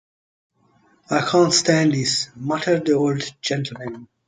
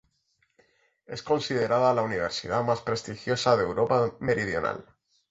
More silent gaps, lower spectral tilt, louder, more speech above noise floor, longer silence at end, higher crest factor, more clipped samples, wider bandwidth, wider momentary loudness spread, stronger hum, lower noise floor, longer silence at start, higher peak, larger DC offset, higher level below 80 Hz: neither; about the same, -4 dB/octave vs -5 dB/octave; first, -20 LUFS vs -26 LUFS; second, 39 dB vs 46 dB; second, 0.25 s vs 0.5 s; about the same, 18 dB vs 20 dB; neither; first, 9.6 kHz vs 8.2 kHz; about the same, 10 LU vs 9 LU; neither; second, -59 dBFS vs -72 dBFS; about the same, 1.1 s vs 1.1 s; about the same, -4 dBFS vs -6 dBFS; neither; about the same, -62 dBFS vs -58 dBFS